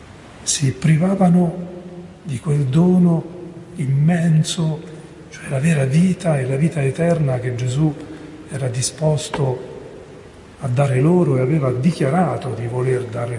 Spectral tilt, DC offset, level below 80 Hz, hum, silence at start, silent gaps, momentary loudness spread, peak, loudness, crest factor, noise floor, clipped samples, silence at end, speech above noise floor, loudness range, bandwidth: -6.5 dB/octave; under 0.1%; -50 dBFS; none; 0 s; none; 19 LU; -4 dBFS; -18 LUFS; 14 dB; -40 dBFS; under 0.1%; 0 s; 23 dB; 4 LU; 11.5 kHz